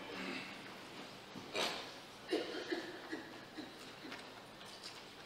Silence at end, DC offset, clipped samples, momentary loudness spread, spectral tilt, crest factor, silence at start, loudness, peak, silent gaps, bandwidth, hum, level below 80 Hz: 0 s; under 0.1%; under 0.1%; 11 LU; -3 dB/octave; 22 dB; 0 s; -45 LUFS; -24 dBFS; none; 16 kHz; none; -78 dBFS